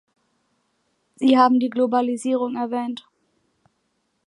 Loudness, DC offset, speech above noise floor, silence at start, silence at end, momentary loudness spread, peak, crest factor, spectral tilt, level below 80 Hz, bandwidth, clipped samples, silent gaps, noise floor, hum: -20 LUFS; under 0.1%; 52 dB; 1.2 s; 1.3 s; 12 LU; -4 dBFS; 20 dB; -4.5 dB/octave; -78 dBFS; 11.5 kHz; under 0.1%; none; -71 dBFS; none